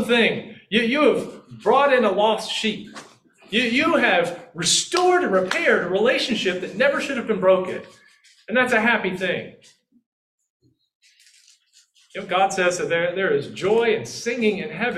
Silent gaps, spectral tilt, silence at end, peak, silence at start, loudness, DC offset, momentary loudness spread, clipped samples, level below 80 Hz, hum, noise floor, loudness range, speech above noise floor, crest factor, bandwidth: 10.06-10.38 s, 10.50-10.60 s, 10.95-11.00 s; -3 dB/octave; 0 s; -4 dBFS; 0 s; -20 LUFS; under 0.1%; 9 LU; under 0.1%; -64 dBFS; none; -58 dBFS; 7 LU; 37 dB; 18 dB; 13.5 kHz